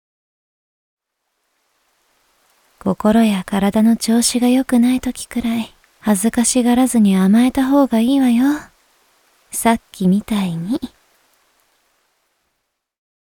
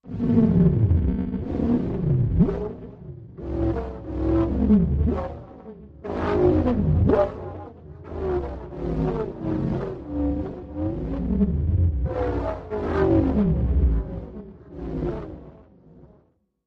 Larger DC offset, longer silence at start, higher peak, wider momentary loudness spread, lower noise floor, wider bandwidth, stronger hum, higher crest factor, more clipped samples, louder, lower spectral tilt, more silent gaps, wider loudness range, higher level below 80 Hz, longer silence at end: neither; first, 2.85 s vs 0.05 s; first, -2 dBFS vs -6 dBFS; second, 10 LU vs 19 LU; first, -73 dBFS vs -62 dBFS; first, 19 kHz vs 5.6 kHz; neither; about the same, 16 dB vs 18 dB; neither; first, -16 LUFS vs -24 LUFS; second, -5 dB/octave vs -11 dB/octave; neither; first, 8 LU vs 5 LU; second, -48 dBFS vs -30 dBFS; first, 2.5 s vs 0.65 s